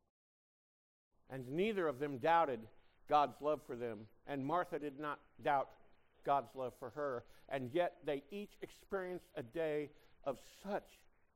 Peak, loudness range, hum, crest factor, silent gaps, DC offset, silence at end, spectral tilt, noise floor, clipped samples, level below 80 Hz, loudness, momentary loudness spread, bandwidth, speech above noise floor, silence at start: -20 dBFS; 5 LU; none; 22 dB; none; under 0.1%; 0.4 s; -6.5 dB/octave; under -90 dBFS; under 0.1%; -70 dBFS; -40 LUFS; 14 LU; 16 kHz; over 50 dB; 1.3 s